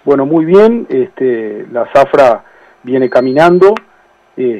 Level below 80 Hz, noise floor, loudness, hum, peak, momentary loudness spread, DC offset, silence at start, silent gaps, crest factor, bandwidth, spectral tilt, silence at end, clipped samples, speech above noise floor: -50 dBFS; -44 dBFS; -10 LUFS; none; 0 dBFS; 12 LU; under 0.1%; 0.05 s; none; 10 dB; 9.2 kHz; -7.5 dB/octave; 0 s; 0.1%; 35 dB